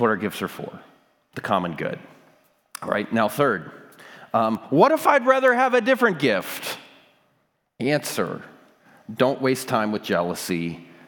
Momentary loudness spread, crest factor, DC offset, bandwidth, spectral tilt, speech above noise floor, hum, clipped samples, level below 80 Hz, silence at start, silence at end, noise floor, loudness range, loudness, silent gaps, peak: 19 LU; 22 dB; under 0.1%; 19.5 kHz; -5 dB/octave; 47 dB; none; under 0.1%; -72 dBFS; 0 s; 0.25 s; -69 dBFS; 7 LU; -22 LUFS; none; -2 dBFS